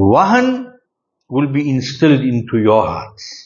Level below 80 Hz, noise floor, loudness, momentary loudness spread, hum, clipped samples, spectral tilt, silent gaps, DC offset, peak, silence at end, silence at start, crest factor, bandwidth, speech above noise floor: -50 dBFS; -70 dBFS; -15 LUFS; 14 LU; none; under 0.1%; -7 dB/octave; none; under 0.1%; 0 dBFS; 0.05 s; 0 s; 14 dB; 7.2 kHz; 55 dB